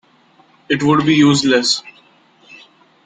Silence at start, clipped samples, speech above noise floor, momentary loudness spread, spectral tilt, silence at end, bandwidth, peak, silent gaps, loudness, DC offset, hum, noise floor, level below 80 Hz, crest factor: 0.7 s; under 0.1%; 39 dB; 8 LU; -4.5 dB/octave; 1.15 s; 9.4 kHz; -2 dBFS; none; -14 LUFS; under 0.1%; none; -52 dBFS; -56 dBFS; 16 dB